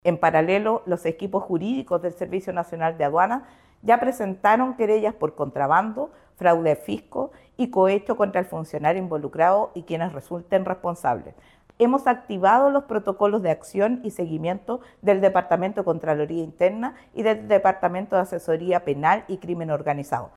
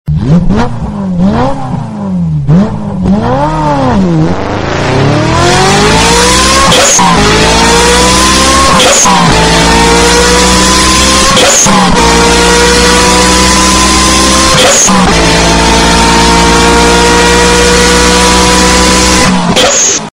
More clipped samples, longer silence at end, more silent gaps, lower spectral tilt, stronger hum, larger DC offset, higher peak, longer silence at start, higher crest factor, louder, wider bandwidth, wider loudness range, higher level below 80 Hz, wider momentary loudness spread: second, under 0.1% vs 1%; about the same, 0.1 s vs 0.1 s; neither; first, -7 dB/octave vs -3 dB/octave; neither; neither; second, -6 dBFS vs 0 dBFS; about the same, 0.05 s vs 0.05 s; first, 16 dB vs 6 dB; second, -23 LUFS vs -5 LUFS; second, 13.5 kHz vs 16.5 kHz; second, 2 LU vs 6 LU; second, -60 dBFS vs -18 dBFS; first, 10 LU vs 7 LU